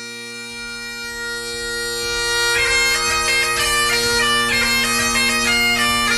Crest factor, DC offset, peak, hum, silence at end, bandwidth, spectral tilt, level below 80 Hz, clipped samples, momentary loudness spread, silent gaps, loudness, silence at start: 14 dB; under 0.1%; -4 dBFS; none; 0 s; 13 kHz; -1 dB/octave; -40 dBFS; under 0.1%; 13 LU; none; -16 LUFS; 0 s